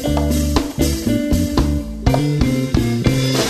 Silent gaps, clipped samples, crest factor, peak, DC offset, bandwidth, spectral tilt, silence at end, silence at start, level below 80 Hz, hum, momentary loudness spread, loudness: none; under 0.1%; 16 dB; 0 dBFS; under 0.1%; 13.5 kHz; -5.5 dB/octave; 0 s; 0 s; -24 dBFS; none; 2 LU; -18 LUFS